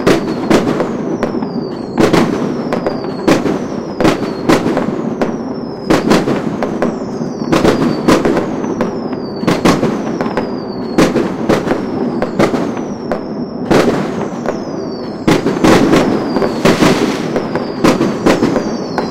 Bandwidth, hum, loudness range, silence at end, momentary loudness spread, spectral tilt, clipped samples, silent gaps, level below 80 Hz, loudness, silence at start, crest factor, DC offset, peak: 16.5 kHz; none; 3 LU; 0 s; 9 LU; -6 dB/octave; under 0.1%; none; -36 dBFS; -14 LUFS; 0 s; 14 dB; 1%; 0 dBFS